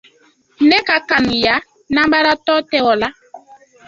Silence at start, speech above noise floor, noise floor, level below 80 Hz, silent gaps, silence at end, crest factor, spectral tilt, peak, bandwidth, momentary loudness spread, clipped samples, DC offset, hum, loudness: 0.6 s; 39 dB; -54 dBFS; -48 dBFS; none; 0.5 s; 16 dB; -4.5 dB/octave; 0 dBFS; 7.6 kHz; 6 LU; under 0.1%; under 0.1%; none; -14 LUFS